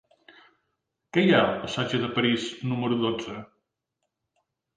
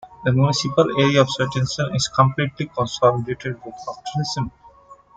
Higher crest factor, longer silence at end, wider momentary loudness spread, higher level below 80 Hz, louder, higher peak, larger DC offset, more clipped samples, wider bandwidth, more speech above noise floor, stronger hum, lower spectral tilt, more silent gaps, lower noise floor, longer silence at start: about the same, 20 dB vs 18 dB; first, 1.3 s vs 0.2 s; about the same, 11 LU vs 13 LU; second, -64 dBFS vs -50 dBFS; second, -25 LUFS vs -20 LUFS; second, -8 dBFS vs -2 dBFS; neither; neither; about the same, 9.4 kHz vs 9.2 kHz; first, 57 dB vs 27 dB; neither; about the same, -6 dB/octave vs -5.5 dB/octave; neither; first, -82 dBFS vs -47 dBFS; first, 1.15 s vs 0.05 s